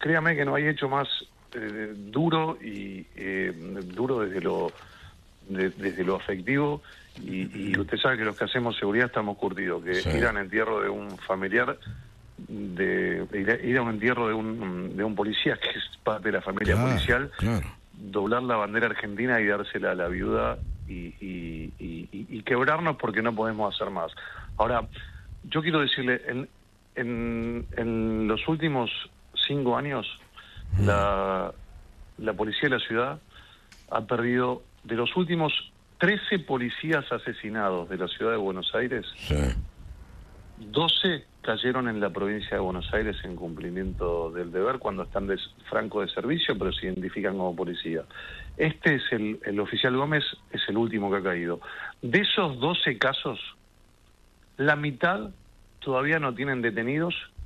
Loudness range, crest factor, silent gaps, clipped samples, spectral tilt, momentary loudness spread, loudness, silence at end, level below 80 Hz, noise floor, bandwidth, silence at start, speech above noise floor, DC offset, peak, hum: 3 LU; 20 dB; none; under 0.1%; -6.5 dB/octave; 13 LU; -27 LUFS; 0 s; -46 dBFS; -58 dBFS; 13 kHz; 0 s; 30 dB; under 0.1%; -8 dBFS; none